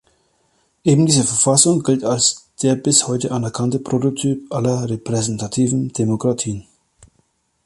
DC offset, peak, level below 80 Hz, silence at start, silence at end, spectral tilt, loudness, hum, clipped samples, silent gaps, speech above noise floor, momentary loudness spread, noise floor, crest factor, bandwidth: under 0.1%; 0 dBFS; -54 dBFS; 0.85 s; 1.05 s; -4.5 dB/octave; -17 LUFS; none; under 0.1%; none; 46 dB; 8 LU; -64 dBFS; 18 dB; 11.5 kHz